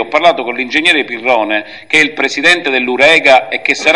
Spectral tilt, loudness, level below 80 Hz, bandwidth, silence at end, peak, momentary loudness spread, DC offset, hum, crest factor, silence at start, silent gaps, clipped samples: -2 dB/octave; -10 LUFS; -54 dBFS; 12 kHz; 0 s; 0 dBFS; 7 LU; 0.6%; none; 12 dB; 0 s; none; 0.5%